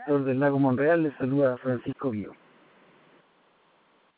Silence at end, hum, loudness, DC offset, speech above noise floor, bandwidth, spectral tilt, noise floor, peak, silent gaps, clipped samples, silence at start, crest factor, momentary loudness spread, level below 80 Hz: 1.85 s; none; -26 LUFS; under 0.1%; 39 dB; 4 kHz; -12 dB/octave; -64 dBFS; -10 dBFS; none; under 0.1%; 0 s; 18 dB; 9 LU; -68 dBFS